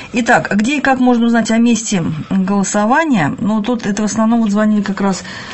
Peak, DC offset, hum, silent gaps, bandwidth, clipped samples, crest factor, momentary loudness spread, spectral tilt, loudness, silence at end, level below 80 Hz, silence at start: 0 dBFS; 0.7%; none; none; 8.6 kHz; under 0.1%; 14 dB; 5 LU; -5 dB/octave; -14 LUFS; 0 s; -46 dBFS; 0 s